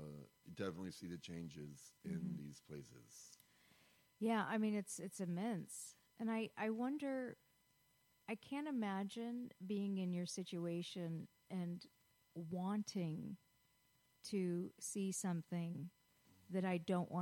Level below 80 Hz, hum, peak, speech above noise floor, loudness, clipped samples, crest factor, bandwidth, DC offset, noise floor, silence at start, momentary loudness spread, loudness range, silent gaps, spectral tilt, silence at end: -82 dBFS; none; -28 dBFS; 33 dB; -45 LUFS; under 0.1%; 16 dB; 16.5 kHz; under 0.1%; -77 dBFS; 0 s; 15 LU; 5 LU; none; -5.5 dB/octave; 0 s